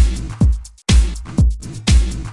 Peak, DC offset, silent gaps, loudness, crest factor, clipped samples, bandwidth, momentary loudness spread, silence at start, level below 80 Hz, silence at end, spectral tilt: -2 dBFS; under 0.1%; none; -18 LUFS; 14 dB; under 0.1%; 11.5 kHz; 5 LU; 0 s; -16 dBFS; 0 s; -5 dB/octave